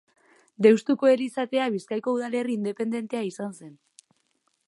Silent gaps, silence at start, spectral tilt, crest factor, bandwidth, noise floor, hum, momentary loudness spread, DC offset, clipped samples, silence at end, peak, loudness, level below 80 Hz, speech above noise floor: none; 0.6 s; -6 dB/octave; 22 dB; 11.5 kHz; -72 dBFS; none; 12 LU; under 0.1%; under 0.1%; 0.95 s; -4 dBFS; -25 LUFS; -80 dBFS; 48 dB